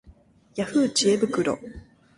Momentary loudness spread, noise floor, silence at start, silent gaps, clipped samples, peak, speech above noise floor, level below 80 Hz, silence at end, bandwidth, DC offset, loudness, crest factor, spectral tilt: 15 LU; -54 dBFS; 0.55 s; none; under 0.1%; -8 dBFS; 30 dB; -54 dBFS; 0.35 s; 11.5 kHz; under 0.1%; -24 LUFS; 16 dB; -4 dB/octave